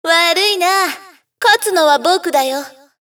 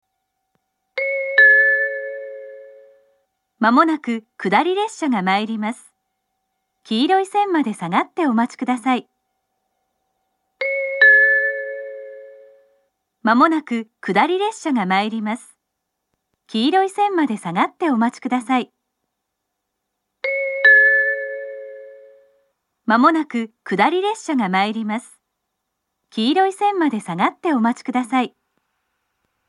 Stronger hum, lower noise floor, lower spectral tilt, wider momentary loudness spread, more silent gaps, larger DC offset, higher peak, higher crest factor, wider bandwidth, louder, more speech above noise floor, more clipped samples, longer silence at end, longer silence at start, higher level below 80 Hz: neither; second, -36 dBFS vs -77 dBFS; second, 0.5 dB/octave vs -5 dB/octave; second, 11 LU vs 17 LU; neither; neither; about the same, 0 dBFS vs 0 dBFS; second, 14 dB vs 20 dB; first, over 20 kHz vs 11.5 kHz; first, -13 LUFS vs -18 LUFS; second, 22 dB vs 59 dB; neither; second, 0.4 s vs 1.2 s; second, 0.05 s vs 0.95 s; about the same, -82 dBFS vs -80 dBFS